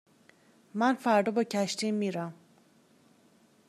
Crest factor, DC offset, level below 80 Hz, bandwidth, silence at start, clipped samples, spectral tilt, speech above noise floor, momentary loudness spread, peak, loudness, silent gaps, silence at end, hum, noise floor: 20 dB; under 0.1%; -86 dBFS; 14.5 kHz; 0.75 s; under 0.1%; -5 dB/octave; 35 dB; 13 LU; -12 dBFS; -29 LUFS; none; 1.35 s; none; -63 dBFS